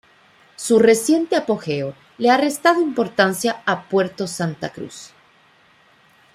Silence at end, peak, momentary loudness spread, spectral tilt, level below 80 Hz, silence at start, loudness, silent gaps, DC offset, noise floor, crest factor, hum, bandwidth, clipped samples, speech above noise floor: 1.25 s; -2 dBFS; 15 LU; -4.5 dB/octave; -66 dBFS; 0.6 s; -19 LUFS; none; under 0.1%; -54 dBFS; 18 dB; none; 15.5 kHz; under 0.1%; 36 dB